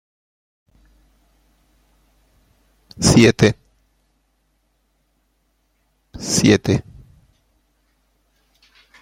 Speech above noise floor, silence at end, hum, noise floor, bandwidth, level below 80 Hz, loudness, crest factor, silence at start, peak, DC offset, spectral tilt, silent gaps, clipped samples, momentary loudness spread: 52 dB; 2.2 s; none; -66 dBFS; 16.5 kHz; -44 dBFS; -16 LUFS; 22 dB; 3 s; -2 dBFS; under 0.1%; -5 dB/octave; none; under 0.1%; 13 LU